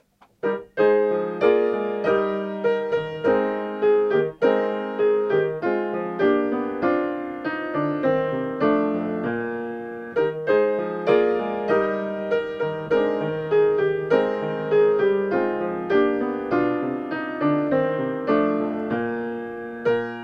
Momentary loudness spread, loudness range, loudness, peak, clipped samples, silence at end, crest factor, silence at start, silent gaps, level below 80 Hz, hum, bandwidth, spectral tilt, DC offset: 8 LU; 2 LU; -23 LUFS; -6 dBFS; under 0.1%; 0 s; 18 dB; 0.45 s; none; -60 dBFS; none; 5.8 kHz; -8 dB/octave; under 0.1%